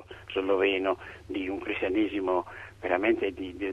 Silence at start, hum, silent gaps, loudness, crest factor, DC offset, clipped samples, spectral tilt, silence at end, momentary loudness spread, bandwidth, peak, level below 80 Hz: 0 s; none; none; -29 LUFS; 18 dB; under 0.1%; under 0.1%; -6.5 dB/octave; 0 s; 10 LU; 9 kHz; -12 dBFS; -56 dBFS